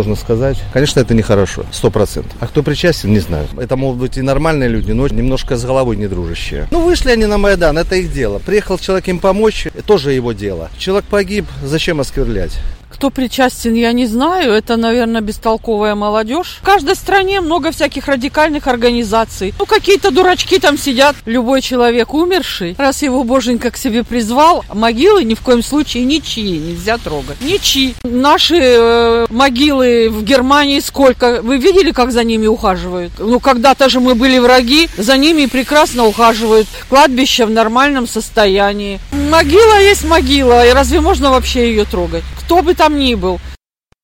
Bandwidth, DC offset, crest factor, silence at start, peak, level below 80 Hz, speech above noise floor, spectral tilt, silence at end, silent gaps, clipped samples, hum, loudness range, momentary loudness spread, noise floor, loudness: 17 kHz; under 0.1%; 12 dB; 0 s; 0 dBFS; -26 dBFS; 30 dB; -4.5 dB/octave; 0.5 s; none; under 0.1%; none; 6 LU; 10 LU; -41 dBFS; -12 LUFS